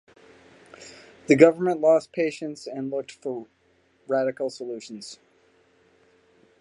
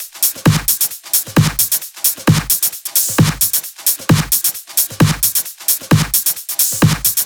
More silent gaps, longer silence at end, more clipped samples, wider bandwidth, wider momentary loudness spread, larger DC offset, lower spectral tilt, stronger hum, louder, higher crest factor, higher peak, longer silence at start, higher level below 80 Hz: neither; first, 1.45 s vs 0 s; neither; second, 11 kHz vs over 20 kHz; first, 26 LU vs 4 LU; neither; first, -6 dB/octave vs -3.5 dB/octave; neither; second, -23 LUFS vs -14 LUFS; first, 24 dB vs 16 dB; about the same, -2 dBFS vs 0 dBFS; first, 0.8 s vs 0 s; second, -72 dBFS vs -38 dBFS